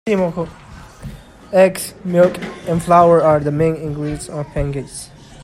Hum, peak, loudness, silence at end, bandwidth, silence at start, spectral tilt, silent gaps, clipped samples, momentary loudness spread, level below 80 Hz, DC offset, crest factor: none; 0 dBFS; -16 LUFS; 0 s; 15 kHz; 0.05 s; -6.5 dB/octave; none; under 0.1%; 22 LU; -38 dBFS; under 0.1%; 16 dB